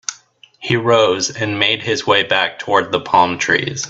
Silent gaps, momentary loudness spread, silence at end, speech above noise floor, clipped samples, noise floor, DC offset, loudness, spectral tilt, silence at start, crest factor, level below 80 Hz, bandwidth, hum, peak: none; 6 LU; 0 s; 31 dB; under 0.1%; -47 dBFS; under 0.1%; -15 LUFS; -3 dB/octave; 0.1 s; 16 dB; -56 dBFS; 8.2 kHz; none; 0 dBFS